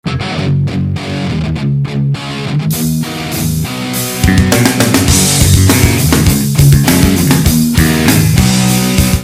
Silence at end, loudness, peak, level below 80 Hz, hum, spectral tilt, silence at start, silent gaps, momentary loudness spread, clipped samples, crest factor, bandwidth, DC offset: 0 s; -11 LUFS; 0 dBFS; -22 dBFS; none; -4.5 dB/octave; 0.05 s; none; 9 LU; 0.4%; 10 dB; 16.5 kHz; under 0.1%